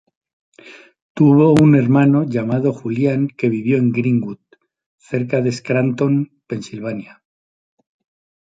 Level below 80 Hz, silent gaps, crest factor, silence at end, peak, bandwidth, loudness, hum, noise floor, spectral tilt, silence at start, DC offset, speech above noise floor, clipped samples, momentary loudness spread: -56 dBFS; 1.02-1.15 s, 4.86-4.98 s; 16 dB; 1.45 s; -2 dBFS; 9.6 kHz; -16 LUFS; none; -43 dBFS; -8.5 dB/octave; 0.65 s; under 0.1%; 28 dB; under 0.1%; 16 LU